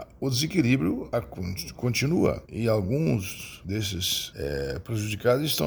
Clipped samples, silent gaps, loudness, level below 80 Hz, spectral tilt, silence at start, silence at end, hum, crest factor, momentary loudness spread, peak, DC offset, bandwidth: under 0.1%; none; -27 LUFS; -48 dBFS; -5 dB/octave; 0 s; 0 s; none; 18 dB; 9 LU; -8 dBFS; under 0.1%; over 20 kHz